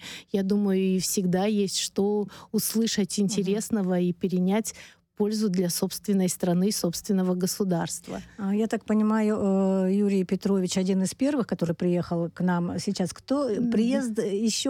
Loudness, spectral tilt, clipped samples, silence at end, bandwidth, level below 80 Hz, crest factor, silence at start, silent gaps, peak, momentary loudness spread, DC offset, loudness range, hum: -26 LUFS; -5.5 dB/octave; under 0.1%; 0 s; 19.5 kHz; -62 dBFS; 12 dB; 0 s; none; -12 dBFS; 5 LU; under 0.1%; 2 LU; none